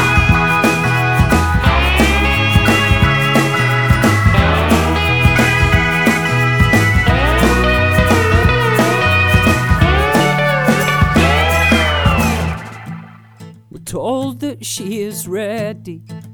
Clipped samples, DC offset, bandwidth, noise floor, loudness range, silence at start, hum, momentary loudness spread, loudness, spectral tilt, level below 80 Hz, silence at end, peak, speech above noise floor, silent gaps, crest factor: under 0.1%; under 0.1%; over 20 kHz; -37 dBFS; 8 LU; 0 s; none; 11 LU; -13 LUFS; -5.5 dB/octave; -22 dBFS; 0 s; 0 dBFS; 15 dB; none; 14 dB